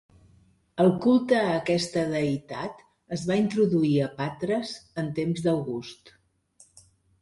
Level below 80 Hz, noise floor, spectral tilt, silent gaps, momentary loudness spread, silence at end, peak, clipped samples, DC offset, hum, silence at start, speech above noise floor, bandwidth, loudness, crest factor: -62 dBFS; -61 dBFS; -6.5 dB/octave; none; 14 LU; 1.15 s; -10 dBFS; under 0.1%; under 0.1%; none; 0.75 s; 35 dB; 11.5 kHz; -26 LUFS; 18 dB